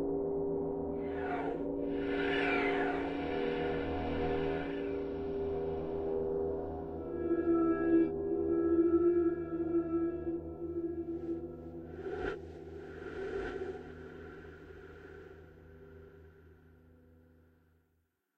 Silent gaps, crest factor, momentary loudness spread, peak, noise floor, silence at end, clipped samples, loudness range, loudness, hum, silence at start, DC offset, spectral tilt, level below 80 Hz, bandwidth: none; 16 dB; 20 LU; -18 dBFS; -78 dBFS; 1.7 s; under 0.1%; 14 LU; -35 LUFS; none; 0 s; under 0.1%; -8.5 dB/octave; -56 dBFS; 5.8 kHz